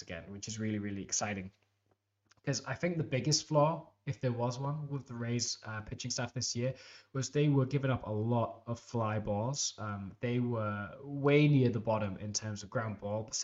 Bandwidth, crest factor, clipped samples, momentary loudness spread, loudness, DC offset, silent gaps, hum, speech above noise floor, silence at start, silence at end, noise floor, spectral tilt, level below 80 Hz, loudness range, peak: 8.2 kHz; 20 dB; under 0.1%; 12 LU; -34 LUFS; under 0.1%; none; none; 44 dB; 0 s; 0 s; -78 dBFS; -5 dB/octave; -64 dBFS; 4 LU; -14 dBFS